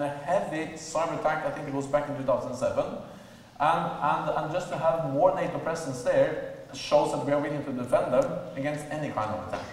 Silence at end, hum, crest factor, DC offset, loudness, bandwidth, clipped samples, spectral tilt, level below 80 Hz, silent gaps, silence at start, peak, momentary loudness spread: 0 s; none; 18 dB; under 0.1%; -28 LUFS; 13.5 kHz; under 0.1%; -5.5 dB/octave; -58 dBFS; none; 0 s; -10 dBFS; 8 LU